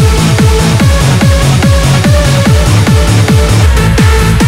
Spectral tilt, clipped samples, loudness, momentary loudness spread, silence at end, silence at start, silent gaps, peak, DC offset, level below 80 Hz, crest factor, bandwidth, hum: -5.5 dB/octave; 3%; -7 LUFS; 0 LU; 0 s; 0 s; none; 0 dBFS; under 0.1%; -12 dBFS; 6 dB; 16.5 kHz; none